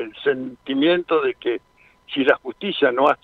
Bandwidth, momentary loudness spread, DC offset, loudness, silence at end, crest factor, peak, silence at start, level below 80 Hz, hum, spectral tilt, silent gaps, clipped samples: 6.4 kHz; 9 LU; under 0.1%; -21 LUFS; 0.1 s; 18 dB; -2 dBFS; 0 s; -64 dBFS; none; -6.5 dB/octave; none; under 0.1%